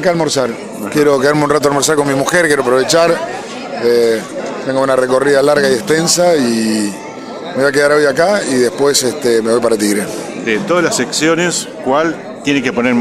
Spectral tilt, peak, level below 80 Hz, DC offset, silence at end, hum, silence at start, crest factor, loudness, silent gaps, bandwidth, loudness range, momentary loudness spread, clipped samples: -3.5 dB/octave; 0 dBFS; -52 dBFS; under 0.1%; 0 s; none; 0 s; 12 dB; -13 LUFS; none; 15.5 kHz; 2 LU; 10 LU; under 0.1%